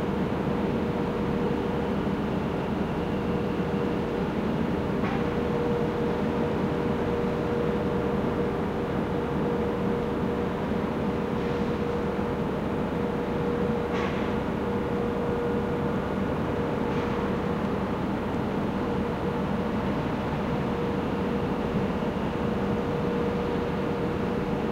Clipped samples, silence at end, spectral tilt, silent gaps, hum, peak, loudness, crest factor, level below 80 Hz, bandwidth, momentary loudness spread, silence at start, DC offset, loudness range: under 0.1%; 0 s; -8 dB/octave; none; none; -14 dBFS; -28 LUFS; 12 dB; -42 dBFS; 16 kHz; 2 LU; 0 s; under 0.1%; 1 LU